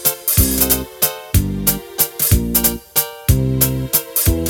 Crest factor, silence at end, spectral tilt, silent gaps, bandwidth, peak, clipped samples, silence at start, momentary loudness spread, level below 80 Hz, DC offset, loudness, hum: 16 dB; 0 s; -4 dB/octave; none; over 20 kHz; 0 dBFS; under 0.1%; 0 s; 5 LU; -26 dBFS; under 0.1%; -15 LUFS; none